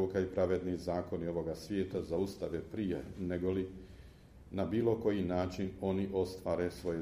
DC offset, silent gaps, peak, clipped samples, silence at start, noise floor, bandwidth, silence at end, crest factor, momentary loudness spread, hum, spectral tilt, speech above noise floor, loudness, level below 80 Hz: under 0.1%; none; -18 dBFS; under 0.1%; 0 s; -56 dBFS; 15.5 kHz; 0 s; 18 dB; 7 LU; none; -7.5 dB/octave; 20 dB; -36 LUFS; -56 dBFS